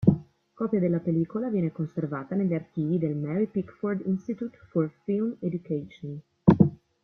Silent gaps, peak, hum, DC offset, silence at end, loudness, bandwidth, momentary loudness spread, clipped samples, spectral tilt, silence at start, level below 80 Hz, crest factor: none; -2 dBFS; none; under 0.1%; 0.3 s; -28 LUFS; 4.1 kHz; 11 LU; under 0.1%; -11.5 dB/octave; 0 s; -56 dBFS; 24 dB